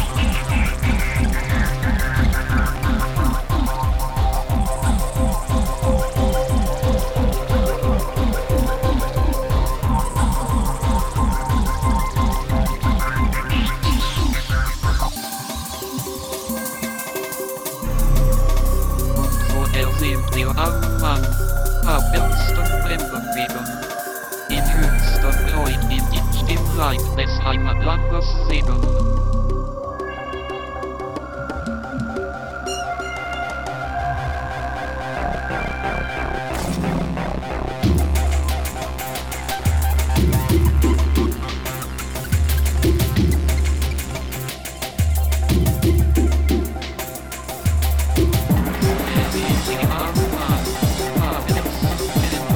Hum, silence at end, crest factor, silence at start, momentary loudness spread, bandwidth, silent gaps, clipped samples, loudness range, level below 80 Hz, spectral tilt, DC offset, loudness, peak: none; 0 s; 16 dB; 0 s; 8 LU; over 20 kHz; none; under 0.1%; 5 LU; -20 dBFS; -5.5 dB/octave; under 0.1%; -21 LUFS; -2 dBFS